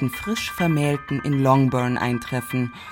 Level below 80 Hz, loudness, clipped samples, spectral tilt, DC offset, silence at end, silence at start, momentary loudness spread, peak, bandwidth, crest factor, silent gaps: -50 dBFS; -22 LUFS; under 0.1%; -6.5 dB/octave; under 0.1%; 0 s; 0 s; 8 LU; -4 dBFS; 17 kHz; 18 dB; none